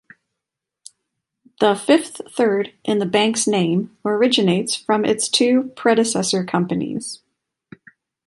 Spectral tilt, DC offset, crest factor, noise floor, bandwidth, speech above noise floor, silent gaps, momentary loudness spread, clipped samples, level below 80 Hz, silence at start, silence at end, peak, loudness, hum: -4 dB/octave; under 0.1%; 18 dB; -84 dBFS; 11.5 kHz; 65 dB; none; 7 LU; under 0.1%; -64 dBFS; 1.6 s; 1.15 s; -2 dBFS; -19 LUFS; none